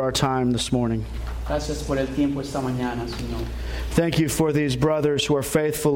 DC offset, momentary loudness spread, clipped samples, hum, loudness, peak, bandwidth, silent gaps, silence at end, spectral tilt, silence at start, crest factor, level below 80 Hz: under 0.1%; 9 LU; under 0.1%; none; -24 LUFS; -6 dBFS; 16.5 kHz; none; 0 s; -5.5 dB/octave; 0 s; 16 dB; -34 dBFS